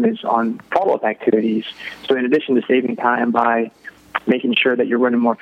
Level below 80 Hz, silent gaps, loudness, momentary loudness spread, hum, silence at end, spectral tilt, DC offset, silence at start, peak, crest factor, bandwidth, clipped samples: -66 dBFS; none; -18 LUFS; 8 LU; none; 0.05 s; -7 dB/octave; under 0.1%; 0 s; 0 dBFS; 18 dB; 6 kHz; under 0.1%